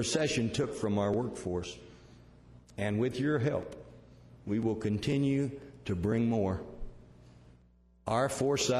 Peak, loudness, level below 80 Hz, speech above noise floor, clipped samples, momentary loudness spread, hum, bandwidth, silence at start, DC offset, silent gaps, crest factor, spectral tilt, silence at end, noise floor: -14 dBFS; -32 LUFS; -54 dBFS; 32 dB; under 0.1%; 17 LU; 60 Hz at -60 dBFS; 14 kHz; 0 s; under 0.1%; none; 18 dB; -5.5 dB/octave; 0 s; -63 dBFS